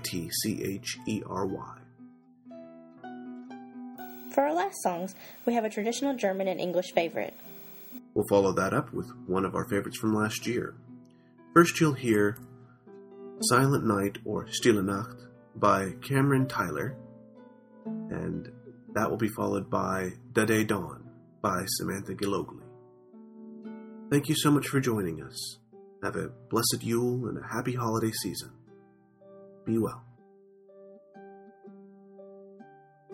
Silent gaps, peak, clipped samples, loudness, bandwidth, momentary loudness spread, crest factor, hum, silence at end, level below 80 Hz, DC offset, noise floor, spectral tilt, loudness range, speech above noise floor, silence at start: none; -6 dBFS; under 0.1%; -29 LUFS; 16.5 kHz; 22 LU; 26 dB; none; 0 s; -64 dBFS; under 0.1%; -58 dBFS; -5 dB/octave; 9 LU; 30 dB; 0 s